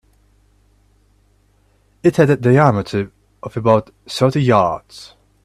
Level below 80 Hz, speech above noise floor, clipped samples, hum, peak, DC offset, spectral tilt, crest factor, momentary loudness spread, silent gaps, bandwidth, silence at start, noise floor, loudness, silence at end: -50 dBFS; 42 dB; under 0.1%; 50 Hz at -40 dBFS; 0 dBFS; under 0.1%; -7.5 dB/octave; 18 dB; 17 LU; none; 13 kHz; 2.05 s; -57 dBFS; -16 LUFS; 0.4 s